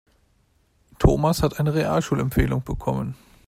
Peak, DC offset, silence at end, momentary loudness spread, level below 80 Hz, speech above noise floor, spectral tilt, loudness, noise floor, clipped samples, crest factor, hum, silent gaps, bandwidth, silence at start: -4 dBFS; under 0.1%; 0.35 s; 7 LU; -32 dBFS; 41 dB; -7 dB/octave; -23 LUFS; -63 dBFS; under 0.1%; 20 dB; none; none; 16 kHz; 1 s